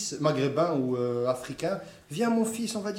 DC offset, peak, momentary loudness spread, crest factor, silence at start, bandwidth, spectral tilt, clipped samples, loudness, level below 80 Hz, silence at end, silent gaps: under 0.1%; -12 dBFS; 6 LU; 18 dB; 0 s; 16.5 kHz; -5.5 dB/octave; under 0.1%; -28 LUFS; -66 dBFS; 0 s; none